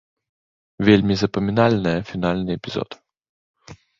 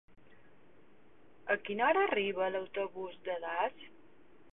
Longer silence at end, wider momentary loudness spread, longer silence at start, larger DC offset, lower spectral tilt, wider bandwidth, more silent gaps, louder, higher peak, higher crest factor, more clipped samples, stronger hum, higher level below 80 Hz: second, 0.25 s vs 0.65 s; second, 12 LU vs 15 LU; second, 0.8 s vs 1.45 s; second, under 0.1% vs 0.2%; first, -7 dB/octave vs -1.5 dB/octave; first, 7.4 kHz vs 4 kHz; first, 3.29-3.54 s vs none; first, -20 LUFS vs -34 LUFS; first, -2 dBFS vs -16 dBFS; about the same, 20 dB vs 20 dB; neither; neither; first, -46 dBFS vs -76 dBFS